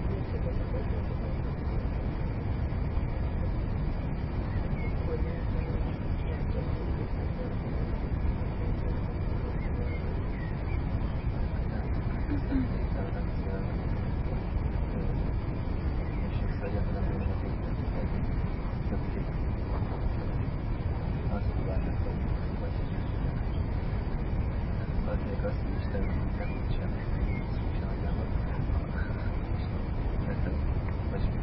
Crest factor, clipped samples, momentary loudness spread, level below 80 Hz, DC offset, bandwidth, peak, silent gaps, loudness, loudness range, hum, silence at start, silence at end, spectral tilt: 14 dB; under 0.1%; 2 LU; -32 dBFS; under 0.1%; 5.6 kHz; -16 dBFS; none; -33 LUFS; 1 LU; none; 0 s; 0 s; -12 dB/octave